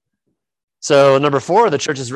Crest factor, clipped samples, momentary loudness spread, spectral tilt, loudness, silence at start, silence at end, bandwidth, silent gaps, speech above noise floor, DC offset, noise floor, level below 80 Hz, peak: 16 dB; under 0.1%; 8 LU; -4.5 dB/octave; -14 LUFS; 0.85 s; 0 s; 11.5 kHz; none; 59 dB; under 0.1%; -73 dBFS; -60 dBFS; 0 dBFS